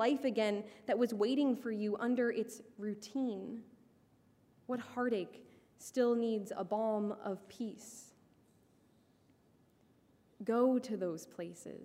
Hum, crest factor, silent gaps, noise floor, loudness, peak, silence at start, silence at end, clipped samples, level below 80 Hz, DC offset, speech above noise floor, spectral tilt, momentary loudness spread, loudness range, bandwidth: none; 18 dB; none; -69 dBFS; -37 LUFS; -20 dBFS; 0 s; 0 s; under 0.1%; -84 dBFS; under 0.1%; 33 dB; -5.5 dB/octave; 14 LU; 7 LU; 15.5 kHz